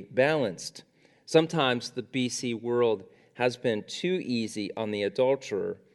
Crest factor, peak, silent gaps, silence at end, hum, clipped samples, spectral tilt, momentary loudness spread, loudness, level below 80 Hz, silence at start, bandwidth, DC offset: 20 dB; -8 dBFS; none; 0.2 s; none; under 0.1%; -4.5 dB/octave; 8 LU; -28 LUFS; -76 dBFS; 0 s; 12.5 kHz; under 0.1%